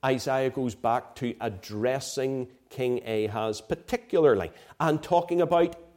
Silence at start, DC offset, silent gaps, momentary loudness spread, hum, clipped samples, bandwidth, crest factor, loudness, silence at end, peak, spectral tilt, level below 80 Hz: 0.05 s; under 0.1%; none; 10 LU; none; under 0.1%; 16.5 kHz; 18 dB; -27 LUFS; 0.15 s; -10 dBFS; -5.5 dB/octave; -58 dBFS